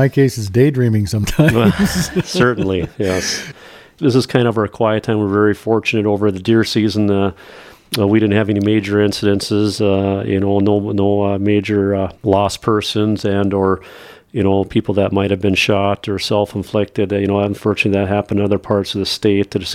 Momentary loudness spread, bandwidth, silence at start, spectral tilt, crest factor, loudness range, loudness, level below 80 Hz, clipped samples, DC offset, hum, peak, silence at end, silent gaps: 5 LU; 16 kHz; 0 s; -6 dB/octave; 16 dB; 2 LU; -16 LUFS; -42 dBFS; under 0.1%; under 0.1%; none; 0 dBFS; 0 s; none